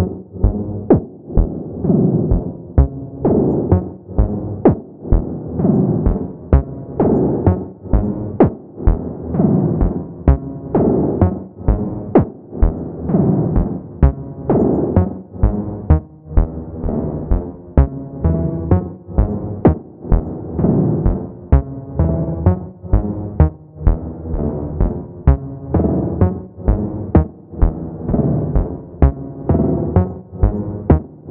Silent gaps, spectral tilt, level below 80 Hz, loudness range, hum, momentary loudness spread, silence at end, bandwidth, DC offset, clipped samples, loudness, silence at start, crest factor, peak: none; -14.5 dB/octave; -22 dBFS; 2 LU; none; 8 LU; 0 s; 3 kHz; under 0.1%; under 0.1%; -18 LUFS; 0 s; 16 dB; 0 dBFS